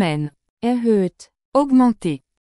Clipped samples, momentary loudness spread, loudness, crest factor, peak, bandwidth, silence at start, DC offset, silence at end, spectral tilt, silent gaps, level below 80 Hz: under 0.1%; 11 LU; -19 LUFS; 14 dB; -4 dBFS; 11.5 kHz; 0 s; under 0.1%; 0.25 s; -7.5 dB/octave; 0.50-0.57 s, 1.45-1.52 s; -54 dBFS